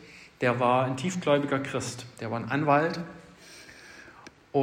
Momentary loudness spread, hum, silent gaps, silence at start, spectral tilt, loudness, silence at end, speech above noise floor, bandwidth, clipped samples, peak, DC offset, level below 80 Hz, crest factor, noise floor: 23 LU; none; none; 0 s; -5.5 dB/octave; -27 LUFS; 0 s; 24 dB; 16 kHz; under 0.1%; -10 dBFS; under 0.1%; -66 dBFS; 18 dB; -51 dBFS